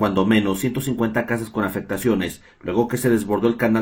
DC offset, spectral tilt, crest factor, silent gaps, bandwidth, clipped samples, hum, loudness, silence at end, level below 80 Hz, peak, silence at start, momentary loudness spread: under 0.1%; -6 dB/octave; 18 dB; none; 19 kHz; under 0.1%; none; -21 LUFS; 0 s; -50 dBFS; -4 dBFS; 0 s; 6 LU